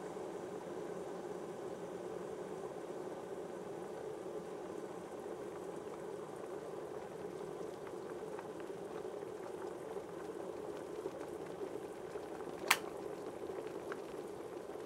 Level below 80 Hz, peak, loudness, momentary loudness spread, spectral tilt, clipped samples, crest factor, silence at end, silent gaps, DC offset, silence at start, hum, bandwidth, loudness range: -78 dBFS; -10 dBFS; -45 LUFS; 2 LU; -4 dB/octave; under 0.1%; 36 dB; 0 s; none; under 0.1%; 0 s; none; 16 kHz; 5 LU